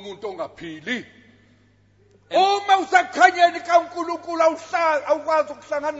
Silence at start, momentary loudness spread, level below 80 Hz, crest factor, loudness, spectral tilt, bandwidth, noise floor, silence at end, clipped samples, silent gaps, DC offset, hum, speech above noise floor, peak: 0 s; 16 LU; -66 dBFS; 20 dB; -20 LUFS; -2.5 dB/octave; 8 kHz; -57 dBFS; 0 s; under 0.1%; none; under 0.1%; 50 Hz at -60 dBFS; 37 dB; 0 dBFS